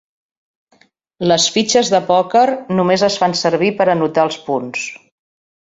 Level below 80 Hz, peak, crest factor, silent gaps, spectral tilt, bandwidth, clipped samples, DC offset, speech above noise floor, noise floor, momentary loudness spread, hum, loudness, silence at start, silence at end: -58 dBFS; 0 dBFS; 16 dB; none; -4 dB/octave; 8.2 kHz; under 0.1%; under 0.1%; 41 dB; -56 dBFS; 8 LU; none; -15 LUFS; 1.2 s; 0.7 s